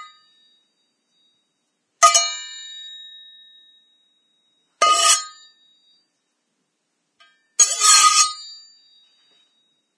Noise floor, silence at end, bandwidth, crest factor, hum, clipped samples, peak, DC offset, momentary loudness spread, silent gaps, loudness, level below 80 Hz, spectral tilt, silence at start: -73 dBFS; 1.45 s; 11 kHz; 22 dB; none; under 0.1%; 0 dBFS; under 0.1%; 25 LU; none; -14 LUFS; under -90 dBFS; 5 dB/octave; 0 s